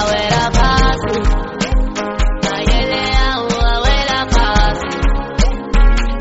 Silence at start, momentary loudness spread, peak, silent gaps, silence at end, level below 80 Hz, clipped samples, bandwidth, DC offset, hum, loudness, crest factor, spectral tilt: 0 s; 5 LU; 0 dBFS; none; 0 s; -16 dBFS; under 0.1%; 8 kHz; under 0.1%; none; -16 LUFS; 12 dB; -3.5 dB/octave